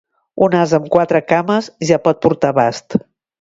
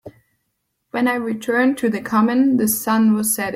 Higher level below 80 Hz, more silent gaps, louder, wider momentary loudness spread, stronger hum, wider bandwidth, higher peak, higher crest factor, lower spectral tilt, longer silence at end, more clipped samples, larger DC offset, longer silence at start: first, -54 dBFS vs -60 dBFS; neither; first, -15 LUFS vs -18 LUFS; about the same, 8 LU vs 6 LU; neither; second, 8 kHz vs 16.5 kHz; first, 0 dBFS vs -4 dBFS; about the same, 16 dB vs 14 dB; first, -6 dB/octave vs -4.5 dB/octave; first, 0.45 s vs 0 s; neither; neither; first, 0.35 s vs 0.05 s